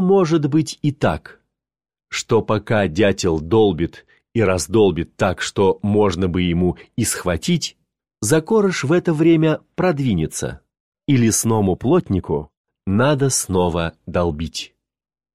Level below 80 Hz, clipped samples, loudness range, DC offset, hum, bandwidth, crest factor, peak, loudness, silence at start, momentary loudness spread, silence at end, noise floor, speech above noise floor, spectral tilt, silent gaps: -42 dBFS; under 0.1%; 2 LU; 0.3%; none; 15 kHz; 16 dB; -4 dBFS; -19 LUFS; 0 s; 10 LU; 0.7 s; under -90 dBFS; over 72 dB; -5.5 dB/octave; 10.80-10.92 s, 12.57-12.64 s